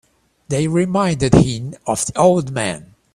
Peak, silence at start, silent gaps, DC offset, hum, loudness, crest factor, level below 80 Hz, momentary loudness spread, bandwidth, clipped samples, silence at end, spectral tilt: 0 dBFS; 0.5 s; none; under 0.1%; none; -17 LUFS; 18 dB; -40 dBFS; 10 LU; 14.5 kHz; under 0.1%; 0.3 s; -5.5 dB/octave